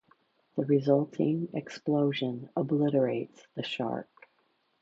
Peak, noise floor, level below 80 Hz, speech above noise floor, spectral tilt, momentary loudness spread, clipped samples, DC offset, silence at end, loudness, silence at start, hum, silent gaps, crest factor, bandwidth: -12 dBFS; -72 dBFS; -76 dBFS; 43 dB; -8 dB/octave; 11 LU; under 0.1%; under 0.1%; 0.8 s; -30 LUFS; 0.55 s; none; none; 18 dB; 7.6 kHz